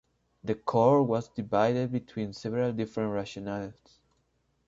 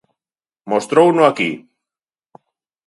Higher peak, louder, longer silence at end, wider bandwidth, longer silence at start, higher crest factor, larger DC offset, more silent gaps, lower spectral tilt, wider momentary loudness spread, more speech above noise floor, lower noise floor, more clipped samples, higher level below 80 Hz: second, -10 dBFS vs 0 dBFS; second, -29 LUFS vs -15 LUFS; second, 0.95 s vs 1.3 s; second, 7.8 kHz vs 11.5 kHz; second, 0.45 s vs 0.65 s; about the same, 20 dB vs 18 dB; neither; neither; first, -7.5 dB/octave vs -5.5 dB/octave; first, 14 LU vs 10 LU; second, 45 dB vs over 76 dB; second, -73 dBFS vs under -90 dBFS; neither; first, -64 dBFS vs -70 dBFS